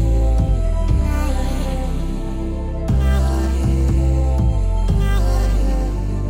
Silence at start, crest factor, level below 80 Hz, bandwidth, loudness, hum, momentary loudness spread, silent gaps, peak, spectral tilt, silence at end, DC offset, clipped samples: 0 s; 12 dB; -18 dBFS; 15 kHz; -20 LUFS; none; 7 LU; none; -4 dBFS; -7.5 dB/octave; 0 s; under 0.1%; under 0.1%